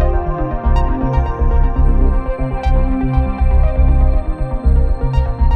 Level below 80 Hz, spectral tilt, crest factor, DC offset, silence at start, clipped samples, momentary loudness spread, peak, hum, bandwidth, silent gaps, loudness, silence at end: -14 dBFS; -10 dB/octave; 12 dB; under 0.1%; 0 s; under 0.1%; 5 LU; -2 dBFS; none; 4.5 kHz; none; -17 LUFS; 0 s